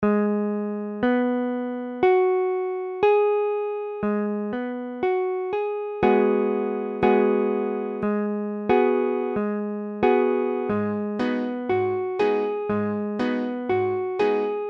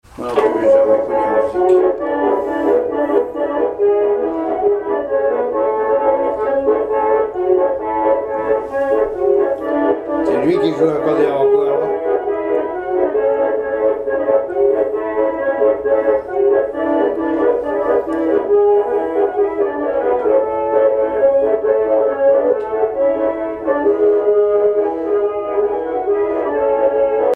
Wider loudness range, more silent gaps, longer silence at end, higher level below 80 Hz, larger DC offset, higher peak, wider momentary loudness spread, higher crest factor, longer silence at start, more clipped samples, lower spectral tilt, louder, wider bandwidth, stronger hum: about the same, 2 LU vs 2 LU; neither; about the same, 0 s vs 0 s; second, -58 dBFS vs -48 dBFS; neither; second, -8 dBFS vs 0 dBFS; first, 8 LU vs 5 LU; about the same, 16 dB vs 14 dB; second, 0 s vs 0.15 s; neither; about the same, -8.5 dB/octave vs -7.5 dB/octave; second, -24 LUFS vs -16 LUFS; first, 5.8 kHz vs 4.5 kHz; neither